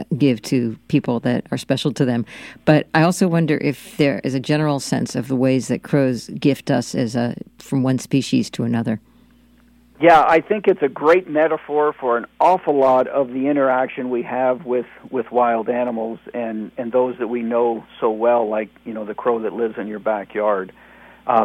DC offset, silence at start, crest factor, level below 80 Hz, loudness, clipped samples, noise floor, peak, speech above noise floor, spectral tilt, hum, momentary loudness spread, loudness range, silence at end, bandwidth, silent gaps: under 0.1%; 0 s; 18 dB; -58 dBFS; -19 LUFS; under 0.1%; -52 dBFS; 0 dBFS; 33 dB; -6.5 dB/octave; none; 9 LU; 4 LU; 0 s; 16.5 kHz; none